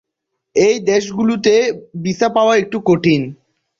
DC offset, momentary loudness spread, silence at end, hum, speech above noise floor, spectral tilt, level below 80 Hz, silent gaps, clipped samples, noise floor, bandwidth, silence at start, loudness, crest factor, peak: under 0.1%; 8 LU; 0.45 s; none; 62 dB; -5.5 dB/octave; -54 dBFS; none; under 0.1%; -76 dBFS; 7.6 kHz; 0.55 s; -15 LUFS; 14 dB; -2 dBFS